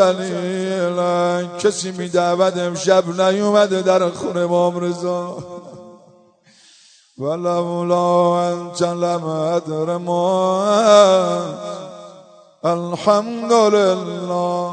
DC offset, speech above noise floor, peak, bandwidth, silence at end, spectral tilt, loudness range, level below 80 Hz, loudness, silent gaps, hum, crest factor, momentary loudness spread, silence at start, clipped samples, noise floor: under 0.1%; 34 dB; 0 dBFS; 9.4 kHz; 0 s; -5 dB/octave; 6 LU; -66 dBFS; -17 LUFS; none; none; 18 dB; 10 LU; 0 s; under 0.1%; -52 dBFS